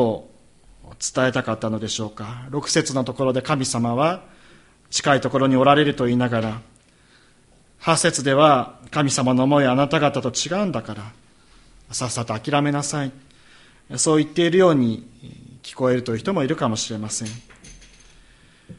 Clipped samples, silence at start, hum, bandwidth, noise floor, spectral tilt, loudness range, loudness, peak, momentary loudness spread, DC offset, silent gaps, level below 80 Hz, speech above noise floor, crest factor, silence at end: under 0.1%; 0 s; none; 11.5 kHz; -54 dBFS; -4.5 dB/octave; 6 LU; -20 LUFS; 0 dBFS; 15 LU; under 0.1%; none; -54 dBFS; 34 dB; 20 dB; 0.05 s